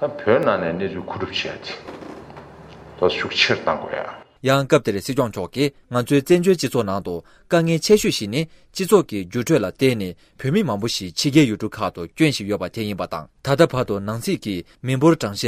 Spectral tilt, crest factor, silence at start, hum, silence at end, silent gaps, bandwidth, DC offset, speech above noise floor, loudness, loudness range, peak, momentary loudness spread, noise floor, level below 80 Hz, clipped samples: -5 dB/octave; 18 dB; 0 s; none; 0 s; none; 16 kHz; under 0.1%; 21 dB; -20 LUFS; 4 LU; -2 dBFS; 13 LU; -41 dBFS; -52 dBFS; under 0.1%